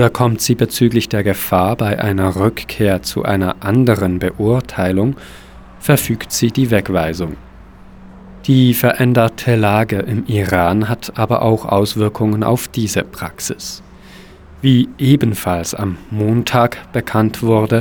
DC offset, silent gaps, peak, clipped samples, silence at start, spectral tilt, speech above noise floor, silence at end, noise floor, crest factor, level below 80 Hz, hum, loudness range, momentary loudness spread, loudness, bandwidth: under 0.1%; none; 0 dBFS; under 0.1%; 0 s; -6 dB/octave; 24 dB; 0 s; -39 dBFS; 16 dB; -42 dBFS; none; 3 LU; 9 LU; -16 LUFS; over 20 kHz